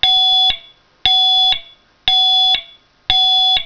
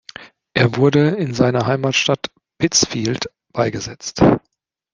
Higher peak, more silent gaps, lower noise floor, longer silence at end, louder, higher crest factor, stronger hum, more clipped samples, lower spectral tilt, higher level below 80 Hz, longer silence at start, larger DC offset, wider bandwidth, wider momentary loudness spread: about the same, 0 dBFS vs -2 dBFS; neither; about the same, -42 dBFS vs -40 dBFS; second, 0 s vs 0.55 s; first, -11 LUFS vs -18 LUFS; about the same, 16 dB vs 18 dB; neither; neither; second, 0 dB/octave vs -4.5 dB/octave; about the same, -42 dBFS vs -46 dBFS; second, 0 s vs 0.2 s; neither; second, 5.4 kHz vs 10 kHz; second, 9 LU vs 12 LU